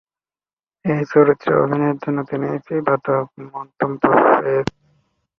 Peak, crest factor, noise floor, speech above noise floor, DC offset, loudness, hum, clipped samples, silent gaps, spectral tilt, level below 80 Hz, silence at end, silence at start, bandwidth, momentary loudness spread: -2 dBFS; 18 dB; under -90 dBFS; over 72 dB; under 0.1%; -18 LUFS; none; under 0.1%; none; -8.5 dB/octave; -58 dBFS; 0.75 s; 0.85 s; 7 kHz; 13 LU